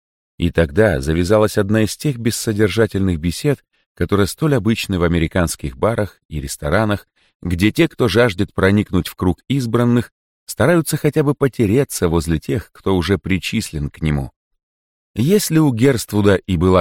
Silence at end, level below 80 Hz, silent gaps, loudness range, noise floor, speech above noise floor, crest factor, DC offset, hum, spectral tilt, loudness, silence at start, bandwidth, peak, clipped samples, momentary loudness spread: 0 s; -36 dBFS; 3.86-3.95 s, 6.25-6.29 s, 7.35-7.40 s, 10.12-10.47 s, 14.36-14.51 s, 14.63-15.14 s; 2 LU; under -90 dBFS; over 74 dB; 14 dB; under 0.1%; none; -6 dB/octave; -17 LUFS; 0.4 s; 17 kHz; -2 dBFS; under 0.1%; 9 LU